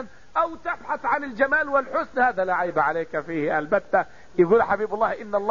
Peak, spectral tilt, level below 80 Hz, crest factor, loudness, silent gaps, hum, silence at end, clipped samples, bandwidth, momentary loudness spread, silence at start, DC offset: -6 dBFS; -7 dB/octave; -56 dBFS; 16 dB; -23 LUFS; none; none; 0 s; under 0.1%; 7.4 kHz; 8 LU; 0 s; 0.6%